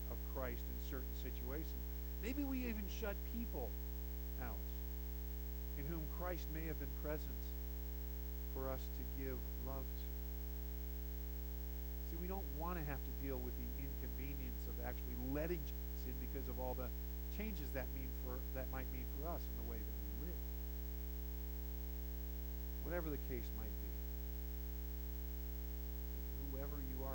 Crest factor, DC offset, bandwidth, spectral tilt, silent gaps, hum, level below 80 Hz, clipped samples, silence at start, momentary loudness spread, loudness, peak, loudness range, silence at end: 16 dB; under 0.1%; 17.5 kHz; -6.5 dB/octave; none; 60 Hz at -45 dBFS; -46 dBFS; under 0.1%; 0 s; 3 LU; -46 LUFS; -28 dBFS; 1 LU; 0 s